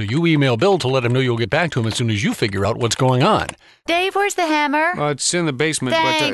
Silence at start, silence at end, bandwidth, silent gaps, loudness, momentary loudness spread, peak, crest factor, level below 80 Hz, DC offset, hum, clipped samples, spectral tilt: 0 s; 0 s; 12.5 kHz; none; -18 LUFS; 4 LU; -2 dBFS; 14 dB; -46 dBFS; under 0.1%; none; under 0.1%; -4.5 dB/octave